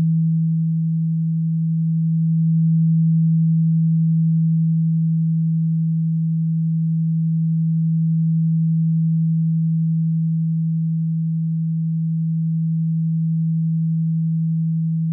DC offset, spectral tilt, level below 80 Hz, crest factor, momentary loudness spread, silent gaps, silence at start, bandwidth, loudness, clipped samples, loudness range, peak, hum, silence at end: under 0.1%; -16.5 dB/octave; -86 dBFS; 6 dB; 4 LU; none; 0 s; 0.3 kHz; -19 LUFS; under 0.1%; 3 LU; -12 dBFS; none; 0 s